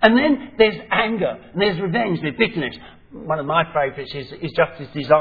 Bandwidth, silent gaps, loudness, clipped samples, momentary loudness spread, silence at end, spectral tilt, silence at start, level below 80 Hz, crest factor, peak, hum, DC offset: 5.4 kHz; none; -20 LUFS; under 0.1%; 12 LU; 0 s; -8.5 dB/octave; 0 s; -48 dBFS; 20 dB; 0 dBFS; none; under 0.1%